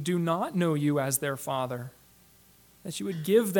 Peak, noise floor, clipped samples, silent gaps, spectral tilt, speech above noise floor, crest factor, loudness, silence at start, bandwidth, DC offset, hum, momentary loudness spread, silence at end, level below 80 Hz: -12 dBFS; -59 dBFS; under 0.1%; none; -5.5 dB/octave; 31 dB; 18 dB; -29 LUFS; 0 s; 19 kHz; under 0.1%; none; 13 LU; 0 s; -70 dBFS